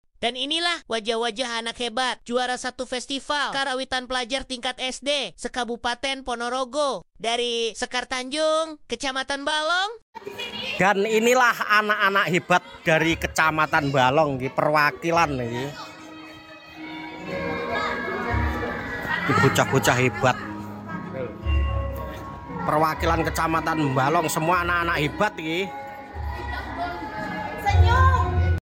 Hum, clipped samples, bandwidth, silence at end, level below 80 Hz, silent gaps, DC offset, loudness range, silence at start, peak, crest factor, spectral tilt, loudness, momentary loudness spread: none; under 0.1%; 17 kHz; 0.05 s; -36 dBFS; 10.02-10.13 s; under 0.1%; 6 LU; 0.2 s; -4 dBFS; 20 dB; -4.5 dB/octave; -23 LUFS; 14 LU